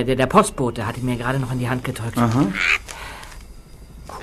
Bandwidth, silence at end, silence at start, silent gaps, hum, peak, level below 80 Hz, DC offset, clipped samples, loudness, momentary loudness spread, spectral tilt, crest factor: 14 kHz; 0 s; 0 s; none; none; 0 dBFS; -40 dBFS; under 0.1%; under 0.1%; -20 LUFS; 20 LU; -5.5 dB/octave; 20 dB